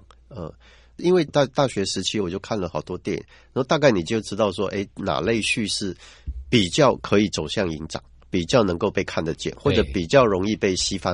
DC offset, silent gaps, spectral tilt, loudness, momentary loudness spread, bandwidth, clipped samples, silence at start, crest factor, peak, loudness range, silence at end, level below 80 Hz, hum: under 0.1%; none; -5 dB/octave; -22 LUFS; 13 LU; 11 kHz; under 0.1%; 0.3 s; 20 dB; -2 dBFS; 2 LU; 0 s; -44 dBFS; none